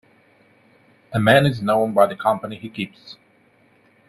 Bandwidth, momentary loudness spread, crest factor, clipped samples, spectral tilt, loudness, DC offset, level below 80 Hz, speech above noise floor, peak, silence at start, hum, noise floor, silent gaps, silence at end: 13.5 kHz; 15 LU; 22 dB; under 0.1%; -6.5 dB/octave; -19 LUFS; under 0.1%; -58 dBFS; 38 dB; 0 dBFS; 1.1 s; none; -57 dBFS; none; 0.95 s